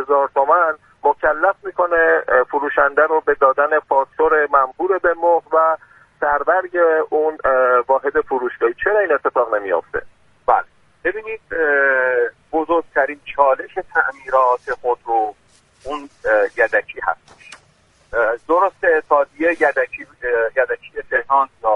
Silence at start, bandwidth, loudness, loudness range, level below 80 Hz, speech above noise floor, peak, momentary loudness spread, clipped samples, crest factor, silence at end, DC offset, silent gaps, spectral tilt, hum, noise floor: 0 s; 9.4 kHz; -17 LUFS; 4 LU; -52 dBFS; 38 dB; 0 dBFS; 9 LU; under 0.1%; 18 dB; 0 s; under 0.1%; none; -5.5 dB/octave; none; -55 dBFS